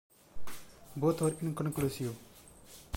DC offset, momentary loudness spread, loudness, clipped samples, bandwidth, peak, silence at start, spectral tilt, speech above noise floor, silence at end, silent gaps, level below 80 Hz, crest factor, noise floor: under 0.1%; 23 LU; -34 LUFS; under 0.1%; 16.5 kHz; -18 dBFS; 0.1 s; -6.5 dB/octave; 22 dB; 0 s; none; -58 dBFS; 18 dB; -55 dBFS